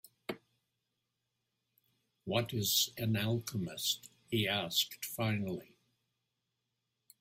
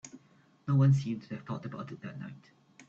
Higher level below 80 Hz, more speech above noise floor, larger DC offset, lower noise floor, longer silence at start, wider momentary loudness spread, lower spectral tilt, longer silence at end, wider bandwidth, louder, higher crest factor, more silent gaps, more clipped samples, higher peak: about the same, -72 dBFS vs -70 dBFS; first, 51 dB vs 33 dB; neither; first, -86 dBFS vs -64 dBFS; first, 0.3 s vs 0.05 s; second, 15 LU vs 20 LU; second, -3.5 dB/octave vs -8 dB/octave; first, 1.55 s vs 0.05 s; first, 16 kHz vs 7.4 kHz; second, -34 LUFS vs -31 LUFS; first, 22 dB vs 16 dB; neither; neither; about the same, -16 dBFS vs -16 dBFS